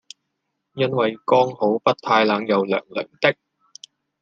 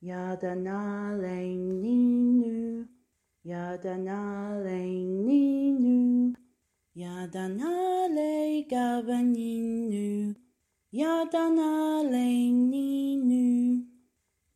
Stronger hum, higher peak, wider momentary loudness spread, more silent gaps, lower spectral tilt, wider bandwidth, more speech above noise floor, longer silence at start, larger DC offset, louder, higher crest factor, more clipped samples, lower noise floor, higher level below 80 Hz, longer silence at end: neither; first, -2 dBFS vs -14 dBFS; second, 8 LU vs 12 LU; neither; about the same, -6 dB/octave vs -7 dB/octave; second, 7.6 kHz vs 12.5 kHz; first, 57 dB vs 47 dB; first, 0.75 s vs 0 s; neither; first, -20 LUFS vs -28 LUFS; first, 20 dB vs 14 dB; neither; about the same, -77 dBFS vs -75 dBFS; about the same, -70 dBFS vs -72 dBFS; first, 0.9 s vs 0.7 s